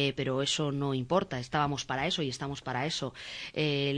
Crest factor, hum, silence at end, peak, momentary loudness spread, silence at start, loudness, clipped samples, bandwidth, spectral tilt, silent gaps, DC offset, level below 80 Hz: 18 dB; none; 0 s; -14 dBFS; 7 LU; 0 s; -32 LUFS; under 0.1%; 10.5 kHz; -4.5 dB/octave; none; under 0.1%; -58 dBFS